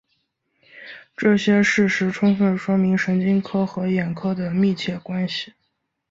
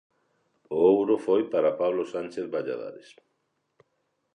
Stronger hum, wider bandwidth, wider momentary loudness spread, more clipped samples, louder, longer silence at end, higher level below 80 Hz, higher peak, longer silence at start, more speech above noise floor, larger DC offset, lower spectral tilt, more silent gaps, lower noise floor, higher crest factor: neither; second, 7.8 kHz vs 9.8 kHz; about the same, 10 LU vs 12 LU; neither; first, -20 LUFS vs -26 LUFS; second, 0.65 s vs 1.35 s; first, -60 dBFS vs -72 dBFS; first, -6 dBFS vs -10 dBFS; about the same, 0.75 s vs 0.7 s; about the same, 53 dB vs 51 dB; neither; about the same, -6.5 dB/octave vs -7 dB/octave; neither; about the same, -73 dBFS vs -76 dBFS; about the same, 16 dB vs 18 dB